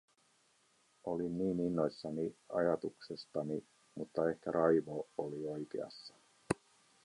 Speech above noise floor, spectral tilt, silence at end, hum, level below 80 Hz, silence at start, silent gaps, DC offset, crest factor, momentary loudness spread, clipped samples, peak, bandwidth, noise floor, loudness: 36 dB; -7 dB/octave; 0.5 s; none; -70 dBFS; 1.05 s; none; under 0.1%; 22 dB; 15 LU; under 0.1%; -16 dBFS; 11.5 kHz; -73 dBFS; -38 LUFS